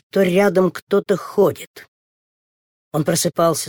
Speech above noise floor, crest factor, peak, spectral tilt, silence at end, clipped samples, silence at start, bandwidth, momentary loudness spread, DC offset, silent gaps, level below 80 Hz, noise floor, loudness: over 72 dB; 16 dB; -4 dBFS; -5 dB/octave; 0 s; under 0.1%; 0.15 s; 19.5 kHz; 10 LU; under 0.1%; 0.82-0.87 s, 1.67-1.74 s, 1.88-2.91 s; -62 dBFS; under -90 dBFS; -18 LUFS